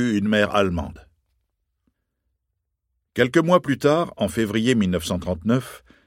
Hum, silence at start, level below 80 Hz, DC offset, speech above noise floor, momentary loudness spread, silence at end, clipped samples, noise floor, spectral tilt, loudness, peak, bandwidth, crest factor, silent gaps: none; 0 s; -48 dBFS; under 0.1%; 57 dB; 9 LU; 0.3 s; under 0.1%; -78 dBFS; -6 dB/octave; -21 LUFS; -2 dBFS; 16.5 kHz; 20 dB; none